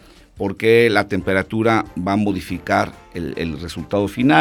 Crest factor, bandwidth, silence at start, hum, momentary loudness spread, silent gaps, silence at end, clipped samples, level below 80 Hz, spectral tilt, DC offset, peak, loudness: 18 dB; 17.5 kHz; 0.35 s; none; 13 LU; none; 0 s; under 0.1%; -46 dBFS; -6.5 dB/octave; under 0.1%; 0 dBFS; -19 LUFS